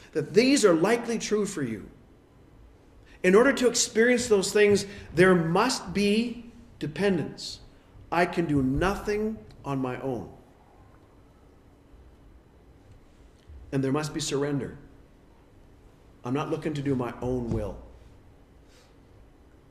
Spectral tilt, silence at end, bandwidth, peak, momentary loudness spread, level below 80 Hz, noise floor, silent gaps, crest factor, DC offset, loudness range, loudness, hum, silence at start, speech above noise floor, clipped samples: -4.5 dB/octave; 1.85 s; 14 kHz; -6 dBFS; 16 LU; -50 dBFS; -55 dBFS; none; 20 dB; under 0.1%; 12 LU; -25 LUFS; none; 0.05 s; 30 dB; under 0.1%